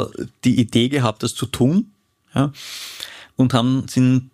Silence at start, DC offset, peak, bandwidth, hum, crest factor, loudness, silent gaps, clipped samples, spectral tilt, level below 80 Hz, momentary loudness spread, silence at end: 0 s; under 0.1%; -2 dBFS; 15.5 kHz; none; 16 dB; -19 LUFS; none; under 0.1%; -6 dB/octave; -50 dBFS; 14 LU; 0.1 s